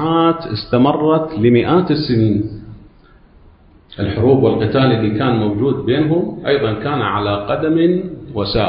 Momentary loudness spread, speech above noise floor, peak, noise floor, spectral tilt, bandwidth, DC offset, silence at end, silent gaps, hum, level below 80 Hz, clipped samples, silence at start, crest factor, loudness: 8 LU; 31 dB; 0 dBFS; -46 dBFS; -12.5 dB/octave; 5.4 kHz; under 0.1%; 0 s; none; none; -40 dBFS; under 0.1%; 0 s; 14 dB; -16 LUFS